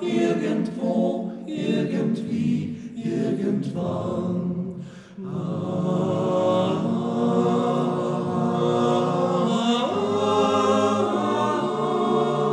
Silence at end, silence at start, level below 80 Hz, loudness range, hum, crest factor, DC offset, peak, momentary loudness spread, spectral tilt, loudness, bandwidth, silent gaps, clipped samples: 0 s; 0 s; -68 dBFS; 5 LU; none; 14 dB; under 0.1%; -8 dBFS; 8 LU; -7 dB/octave; -23 LUFS; 10.5 kHz; none; under 0.1%